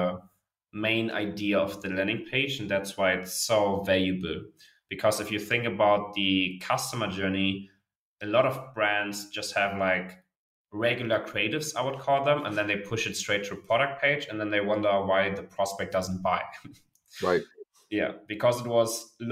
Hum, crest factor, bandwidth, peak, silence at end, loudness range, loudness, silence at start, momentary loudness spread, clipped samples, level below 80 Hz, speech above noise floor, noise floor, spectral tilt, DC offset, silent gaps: none; 18 dB; 16 kHz; -10 dBFS; 0 s; 2 LU; -28 LUFS; 0 s; 8 LU; under 0.1%; -64 dBFS; 35 dB; -63 dBFS; -4 dB/octave; under 0.1%; 7.96-8.16 s, 10.36-10.65 s